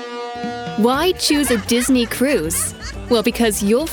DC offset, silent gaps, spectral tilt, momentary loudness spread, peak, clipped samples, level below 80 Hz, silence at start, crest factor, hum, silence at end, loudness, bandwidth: under 0.1%; none; -3.5 dB/octave; 10 LU; -2 dBFS; under 0.1%; -38 dBFS; 0 s; 16 dB; none; 0 s; -18 LUFS; over 20 kHz